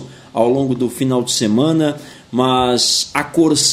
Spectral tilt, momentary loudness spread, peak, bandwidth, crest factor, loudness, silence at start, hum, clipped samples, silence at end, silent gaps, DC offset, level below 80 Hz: -4 dB/octave; 7 LU; 0 dBFS; 16 kHz; 16 dB; -16 LUFS; 0 s; none; under 0.1%; 0 s; none; under 0.1%; -50 dBFS